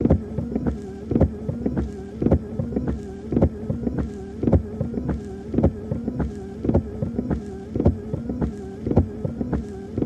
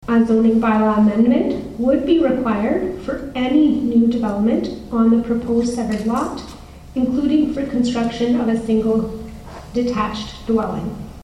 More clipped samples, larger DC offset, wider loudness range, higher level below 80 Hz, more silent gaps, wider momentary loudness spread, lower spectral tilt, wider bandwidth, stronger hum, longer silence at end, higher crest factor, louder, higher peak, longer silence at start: neither; neither; about the same, 1 LU vs 3 LU; first, -32 dBFS vs -40 dBFS; neither; second, 7 LU vs 12 LU; first, -10.5 dB/octave vs -7 dB/octave; second, 8.6 kHz vs 10.5 kHz; neither; about the same, 0 s vs 0 s; first, 20 dB vs 14 dB; second, -25 LUFS vs -18 LUFS; about the same, -4 dBFS vs -4 dBFS; about the same, 0 s vs 0 s